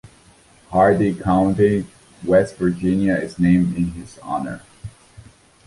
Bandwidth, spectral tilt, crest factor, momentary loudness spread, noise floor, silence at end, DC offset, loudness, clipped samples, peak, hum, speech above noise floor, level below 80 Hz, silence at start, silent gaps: 11.5 kHz; -8 dB/octave; 16 dB; 19 LU; -51 dBFS; 0.8 s; under 0.1%; -19 LUFS; under 0.1%; -2 dBFS; none; 33 dB; -44 dBFS; 0.7 s; none